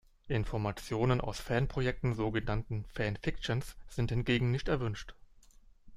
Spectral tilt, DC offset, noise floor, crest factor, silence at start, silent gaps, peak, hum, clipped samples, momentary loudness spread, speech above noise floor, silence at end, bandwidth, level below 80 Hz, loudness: -6.5 dB/octave; under 0.1%; -59 dBFS; 20 dB; 0.25 s; none; -14 dBFS; none; under 0.1%; 7 LU; 26 dB; 0 s; 14.5 kHz; -46 dBFS; -34 LUFS